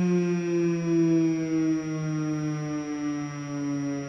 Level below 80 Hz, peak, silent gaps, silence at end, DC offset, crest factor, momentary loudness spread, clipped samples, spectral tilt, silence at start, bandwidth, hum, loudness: -64 dBFS; -14 dBFS; none; 0 s; under 0.1%; 12 dB; 8 LU; under 0.1%; -7.5 dB/octave; 0 s; 7 kHz; none; -27 LUFS